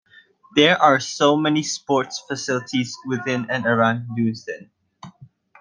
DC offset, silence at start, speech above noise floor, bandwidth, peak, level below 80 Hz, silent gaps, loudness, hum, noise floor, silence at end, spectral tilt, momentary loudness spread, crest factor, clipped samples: under 0.1%; 0.55 s; 32 dB; 10 kHz; 0 dBFS; -66 dBFS; none; -20 LUFS; none; -52 dBFS; 0.35 s; -4.5 dB/octave; 11 LU; 20 dB; under 0.1%